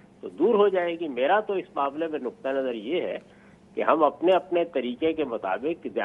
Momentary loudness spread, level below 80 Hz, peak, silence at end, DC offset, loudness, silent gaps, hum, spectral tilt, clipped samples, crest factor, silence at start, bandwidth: 9 LU; -68 dBFS; -6 dBFS; 0 s; under 0.1%; -26 LUFS; none; none; -7 dB/octave; under 0.1%; 20 dB; 0.25 s; 5.4 kHz